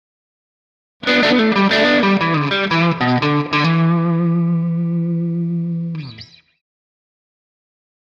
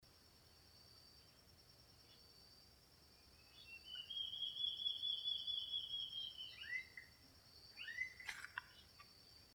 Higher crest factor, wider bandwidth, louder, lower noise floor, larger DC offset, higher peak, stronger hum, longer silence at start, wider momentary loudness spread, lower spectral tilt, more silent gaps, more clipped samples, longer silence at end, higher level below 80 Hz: second, 14 dB vs 20 dB; second, 7.2 kHz vs over 20 kHz; first, -16 LUFS vs -45 LUFS; second, -40 dBFS vs -68 dBFS; neither; first, -4 dBFS vs -30 dBFS; neither; first, 1 s vs 0 s; second, 10 LU vs 24 LU; first, -7 dB/octave vs -0.5 dB/octave; neither; neither; first, 1.95 s vs 0 s; first, -58 dBFS vs -76 dBFS